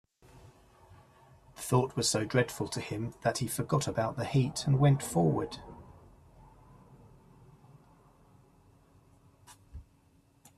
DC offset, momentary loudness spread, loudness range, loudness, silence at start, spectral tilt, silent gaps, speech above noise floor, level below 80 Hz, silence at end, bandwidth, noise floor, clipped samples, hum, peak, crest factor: under 0.1%; 25 LU; 5 LU; -30 LUFS; 0.35 s; -5.5 dB/octave; none; 36 dB; -60 dBFS; 0.75 s; 14 kHz; -65 dBFS; under 0.1%; none; -12 dBFS; 22 dB